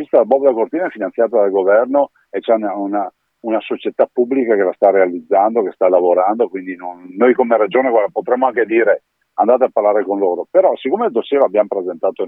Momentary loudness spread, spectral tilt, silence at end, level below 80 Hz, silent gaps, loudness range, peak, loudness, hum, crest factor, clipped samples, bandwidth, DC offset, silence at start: 8 LU; -8.5 dB/octave; 0 s; -76 dBFS; none; 2 LU; 0 dBFS; -15 LUFS; none; 14 dB; under 0.1%; 3.9 kHz; under 0.1%; 0 s